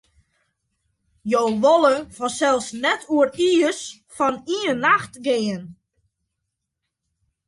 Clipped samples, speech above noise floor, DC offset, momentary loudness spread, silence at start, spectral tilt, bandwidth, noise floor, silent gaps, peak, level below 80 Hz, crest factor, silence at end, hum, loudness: under 0.1%; 60 dB; under 0.1%; 11 LU; 1.25 s; -3.5 dB/octave; 11.5 kHz; -80 dBFS; none; -4 dBFS; -62 dBFS; 18 dB; 1.75 s; none; -20 LUFS